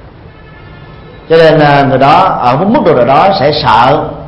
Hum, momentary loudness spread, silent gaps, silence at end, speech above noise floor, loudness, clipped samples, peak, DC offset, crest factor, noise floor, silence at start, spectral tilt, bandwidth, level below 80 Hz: none; 4 LU; none; 0 s; 26 dB; -7 LUFS; 1%; 0 dBFS; under 0.1%; 8 dB; -32 dBFS; 0.05 s; -7.5 dB/octave; 10.5 kHz; -36 dBFS